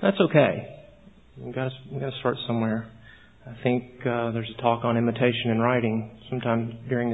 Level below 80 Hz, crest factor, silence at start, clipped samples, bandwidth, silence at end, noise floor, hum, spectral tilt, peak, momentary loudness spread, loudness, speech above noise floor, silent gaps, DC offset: -58 dBFS; 22 dB; 0 s; under 0.1%; 4 kHz; 0 s; -52 dBFS; none; -10 dB/octave; -4 dBFS; 13 LU; -26 LUFS; 27 dB; none; 0.1%